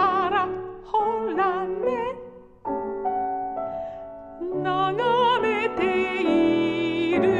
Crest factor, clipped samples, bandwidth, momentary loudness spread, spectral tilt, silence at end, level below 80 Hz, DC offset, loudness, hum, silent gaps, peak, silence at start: 14 dB; under 0.1%; 8.4 kHz; 14 LU; -6.5 dB/octave; 0 s; -54 dBFS; under 0.1%; -24 LUFS; none; none; -10 dBFS; 0 s